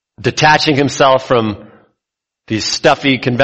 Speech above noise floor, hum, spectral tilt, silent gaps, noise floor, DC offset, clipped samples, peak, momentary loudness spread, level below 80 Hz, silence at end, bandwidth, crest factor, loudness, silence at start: 68 dB; none; -4.5 dB/octave; none; -81 dBFS; under 0.1%; under 0.1%; 0 dBFS; 11 LU; -46 dBFS; 0 s; 8.4 kHz; 14 dB; -13 LUFS; 0.2 s